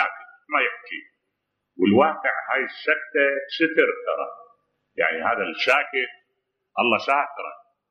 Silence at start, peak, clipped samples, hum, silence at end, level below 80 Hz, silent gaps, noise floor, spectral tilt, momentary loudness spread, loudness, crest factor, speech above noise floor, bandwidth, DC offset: 0 s; -4 dBFS; under 0.1%; none; 0.35 s; -74 dBFS; none; -78 dBFS; -5.5 dB/octave; 15 LU; -22 LUFS; 22 dB; 56 dB; 10.5 kHz; under 0.1%